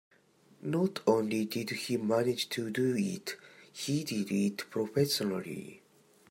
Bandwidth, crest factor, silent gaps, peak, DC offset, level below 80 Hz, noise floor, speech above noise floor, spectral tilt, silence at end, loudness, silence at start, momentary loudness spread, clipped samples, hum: 16 kHz; 20 dB; none; -12 dBFS; under 0.1%; -76 dBFS; -64 dBFS; 32 dB; -5 dB/octave; 0.55 s; -32 LUFS; 0.6 s; 13 LU; under 0.1%; none